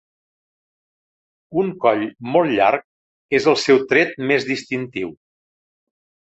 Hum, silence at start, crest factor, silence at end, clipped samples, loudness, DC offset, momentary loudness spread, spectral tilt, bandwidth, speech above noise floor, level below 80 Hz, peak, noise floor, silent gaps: none; 1.5 s; 18 dB; 1.05 s; under 0.1%; -19 LUFS; under 0.1%; 11 LU; -5 dB/octave; 8.2 kHz; over 72 dB; -62 dBFS; -2 dBFS; under -90 dBFS; 2.84-3.29 s